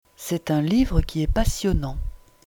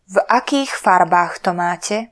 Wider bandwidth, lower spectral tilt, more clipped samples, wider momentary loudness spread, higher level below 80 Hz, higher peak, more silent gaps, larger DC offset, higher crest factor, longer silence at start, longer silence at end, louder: first, over 20 kHz vs 11 kHz; first, -6 dB/octave vs -4 dB/octave; neither; first, 12 LU vs 7 LU; first, -28 dBFS vs -62 dBFS; second, -6 dBFS vs 0 dBFS; neither; neither; about the same, 18 dB vs 16 dB; about the same, 0.2 s vs 0.1 s; first, 0.3 s vs 0.05 s; second, -24 LUFS vs -16 LUFS